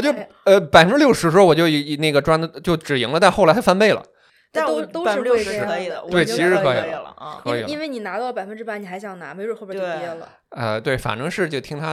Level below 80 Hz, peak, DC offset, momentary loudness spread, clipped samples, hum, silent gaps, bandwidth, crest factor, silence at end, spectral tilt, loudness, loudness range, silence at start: -50 dBFS; 0 dBFS; under 0.1%; 16 LU; under 0.1%; none; none; 15.5 kHz; 18 dB; 0 s; -5 dB/octave; -18 LUFS; 12 LU; 0 s